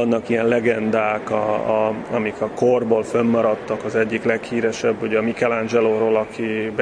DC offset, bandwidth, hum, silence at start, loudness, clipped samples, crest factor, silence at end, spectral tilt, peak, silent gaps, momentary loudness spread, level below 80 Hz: under 0.1%; 10 kHz; none; 0 s; -20 LUFS; under 0.1%; 16 dB; 0 s; -6 dB/octave; -4 dBFS; none; 5 LU; -56 dBFS